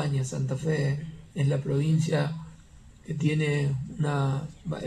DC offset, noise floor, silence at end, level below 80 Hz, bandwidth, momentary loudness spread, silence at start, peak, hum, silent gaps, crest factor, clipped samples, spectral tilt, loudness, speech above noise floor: under 0.1%; -51 dBFS; 0 s; -54 dBFS; 10.5 kHz; 11 LU; 0 s; -12 dBFS; none; none; 16 dB; under 0.1%; -7 dB/octave; -28 LUFS; 24 dB